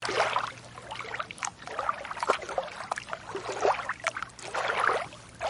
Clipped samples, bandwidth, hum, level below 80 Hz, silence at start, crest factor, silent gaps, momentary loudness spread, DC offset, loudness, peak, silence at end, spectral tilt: under 0.1%; 11.5 kHz; none; -62 dBFS; 0 s; 24 dB; none; 11 LU; under 0.1%; -32 LUFS; -8 dBFS; 0 s; -2 dB/octave